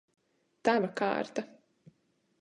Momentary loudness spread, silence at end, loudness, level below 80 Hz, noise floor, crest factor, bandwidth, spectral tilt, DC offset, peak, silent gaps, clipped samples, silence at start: 11 LU; 0.95 s; -31 LUFS; -76 dBFS; -74 dBFS; 22 dB; 10.5 kHz; -5.5 dB/octave; under 0.1%; -12 dBFS; none; under 0.1%; 0.65 s